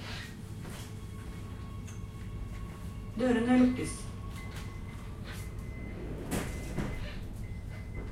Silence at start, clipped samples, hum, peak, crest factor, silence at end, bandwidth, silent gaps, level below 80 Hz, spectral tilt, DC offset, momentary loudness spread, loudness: 0 s; under 0.1%; none; -14 dBFS; 20 dB; 0 s; 16 kHz; none; -44 dBFS; -6 dB/octave; under 0.1%; 15 LU; -36 LUFS